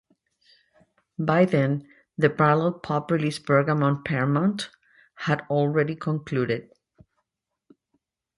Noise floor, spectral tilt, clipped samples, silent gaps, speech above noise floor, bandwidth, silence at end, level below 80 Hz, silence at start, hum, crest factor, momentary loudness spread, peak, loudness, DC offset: -83 dBFS; -7.5 dB/octave; under 0.1%; none; 59 dB; 11.5 kHz; 1.75 s; -64 dBFS; 1.2 s; none; 20 dB; 11 LU; -4 dBFS; -24 LUFS; under 0.1%